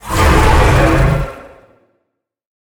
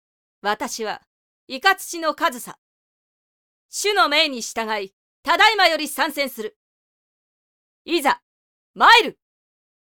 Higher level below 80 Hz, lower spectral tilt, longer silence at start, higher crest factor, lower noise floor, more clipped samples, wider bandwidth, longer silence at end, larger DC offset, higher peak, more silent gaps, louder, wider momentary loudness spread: first, -18 dBFS vs -66 dBFS; first, -5.5 dB/octave vs -0.5 dB/octave; second, 0.05 s vs 0.45 s; second, 14 dB vs 22 dB; second, -71 dBFS vs under -90 dBFS; neither; about the same, over 20 kHz vs 19.5 kHz; first, 1.15 s vs 0.7 s; neither; about the same, 0 dBFS vs 0 dBFS; second, none vs 1.07-1.47 s, 2.58-3.69 s, 4.93-5.23 s, 6.56-7.85 s, 8.22-8.74 s; first, -12 LUFS vs -19 LUFS; second, 9 LU vs 19 LU